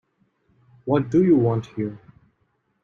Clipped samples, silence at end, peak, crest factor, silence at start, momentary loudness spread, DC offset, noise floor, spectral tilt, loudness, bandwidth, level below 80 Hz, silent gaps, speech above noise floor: under 0.1%; 0.85 s; -6 dBFS; 18 dB; 0.85 s; 14 LU; under 0.1%; -69 dBFS; -9.5 dB/octave; -21 LUFS; 7.2 kHz; -60 dBFS; none; 49 dB